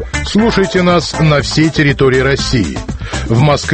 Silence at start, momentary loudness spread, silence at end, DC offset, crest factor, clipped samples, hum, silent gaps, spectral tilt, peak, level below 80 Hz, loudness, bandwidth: 0 s; 7 LU; 0 s; under 0.1%; 12 dB; under 0.1%; none; none; -5.5 dB/octave; 0 dBFS; -26 dBFS; -12 LUFS; 8.8 kHz